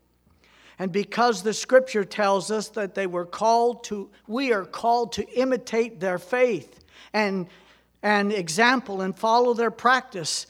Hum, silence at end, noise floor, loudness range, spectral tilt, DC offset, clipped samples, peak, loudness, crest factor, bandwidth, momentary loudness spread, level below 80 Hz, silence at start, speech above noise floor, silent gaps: none; 0.05 s; -61 dBFS; 3 LU; -4 dB/octave; under 0.1%; under 0.1%; -6 dBFS; -24 LUFS; 20 dB; 15.5 kHz; 9 LU; -66 dBFS; 0.8 s; 37 dB; none